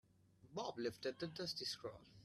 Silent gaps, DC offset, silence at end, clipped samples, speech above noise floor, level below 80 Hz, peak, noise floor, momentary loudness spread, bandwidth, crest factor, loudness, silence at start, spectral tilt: none; under 0.1%; 0 s; under 0.1%; 22 dB; -78 dBFS; -30 dBFS; -69 dBFS; 7 LU; 14 kHz; 18 dB; -46 LUFS; 0.4 s; -4 dB/octave